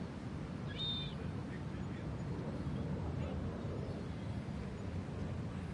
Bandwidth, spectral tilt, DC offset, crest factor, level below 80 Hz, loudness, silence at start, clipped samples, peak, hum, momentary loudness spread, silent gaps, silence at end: 11 kHz; -7 dB/octave; under 0.1%; 14 dB; -54 dBFS; -42 LUFS; 0 s; under 0.1%; -28 dBFS; none; 4 LU; none; 0 s